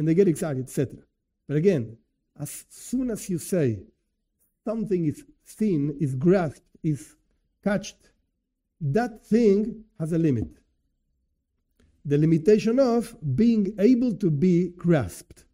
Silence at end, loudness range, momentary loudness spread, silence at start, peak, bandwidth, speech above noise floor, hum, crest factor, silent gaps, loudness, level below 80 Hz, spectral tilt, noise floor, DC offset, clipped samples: 0.35 s; 7 LU; 16 LU; 0 s; -8 dBFS; 16 kHz; 55 dB; none; 18 dB; none; -24 LUFS; -54 dBFS; -7.5 dB/octave; -78 dBFS; under 0.1%; under 0.1%